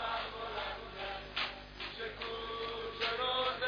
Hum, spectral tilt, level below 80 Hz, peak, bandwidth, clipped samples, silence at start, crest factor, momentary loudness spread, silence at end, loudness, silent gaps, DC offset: 50 Hz at -55 dBFS; -4 dB/octave; -56 dBFS; -22 dBFS; 5.4 kHz; under 0.1%; 0 s; 18 dB; 9 LU; 0 s; -38 LUFS; none; under 0.1%